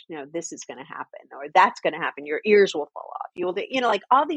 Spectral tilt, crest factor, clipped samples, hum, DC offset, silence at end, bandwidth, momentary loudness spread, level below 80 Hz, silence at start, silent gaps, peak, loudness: -3.5 dB/octave; 20 dB; under 0.1%; none; under 0.1%; 0 s; 8.6 kHz; 18 LU; -76 dBFS; 0.1 s; none; -4 dBFS; -23 LUFS